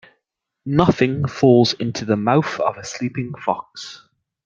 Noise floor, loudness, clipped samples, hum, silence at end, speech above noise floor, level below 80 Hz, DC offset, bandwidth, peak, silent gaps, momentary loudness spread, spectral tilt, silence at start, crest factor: -77 dBFS; -19 LUFS; under 0.1%; none; 0.5 s; 58 dB; -54 dBFS; under 0.1%; 7.6 kHz; 0 dBFS; none; 16 LU; -6 dB/octave; 0.65 s; 20 dB